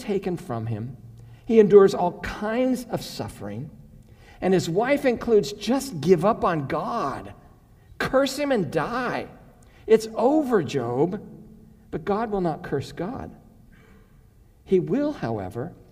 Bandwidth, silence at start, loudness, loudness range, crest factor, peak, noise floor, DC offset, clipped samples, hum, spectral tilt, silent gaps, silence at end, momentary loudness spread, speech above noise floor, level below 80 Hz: 16 kHz; 0 s; -23 LUFS; 7 LU; 22 dB; -2 dBFS; -53 dBFS; under 0.1%; under 0.1%; none; -6.5 dB/octave; none; 0.15 s; 16 LU; 30 dB; -50 dBFS